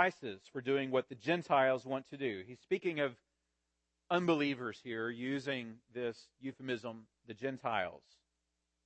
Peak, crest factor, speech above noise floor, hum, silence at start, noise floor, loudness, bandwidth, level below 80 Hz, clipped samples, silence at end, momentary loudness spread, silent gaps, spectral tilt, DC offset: -14 dBFS; 24 dB; 48 dB; none; 0 s; -85 dBFS; -37 LUFS; 8.4 kHz; -82 dBFS; under 0.1%; 0.85 s; 15 LU; none; -6 dB/octave; under 0.1%